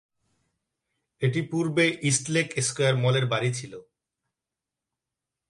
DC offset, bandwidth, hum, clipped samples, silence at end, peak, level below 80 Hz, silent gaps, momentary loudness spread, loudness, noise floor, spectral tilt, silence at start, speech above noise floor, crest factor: under 0.1%; 11.5 kHz; none; under 0.1%; 1.7 s; -8 dBFS; -68 dBFS; none; 7 LU; -25 LUFS; -88 dBFS; -4.5 dB/octave; 1.2 s; 63 dB; 20 dB